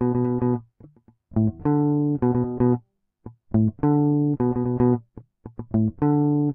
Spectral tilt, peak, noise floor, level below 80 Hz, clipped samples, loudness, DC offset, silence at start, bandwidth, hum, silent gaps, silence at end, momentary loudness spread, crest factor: -15 dB/octave; -8 dBFS; -52 dBFS; -48 dBFS; under 0.1%; -23 LUFS; under 0.1%; 0 s; 2.7 kHz; none; none; 0 s; 7 LU; 14 dB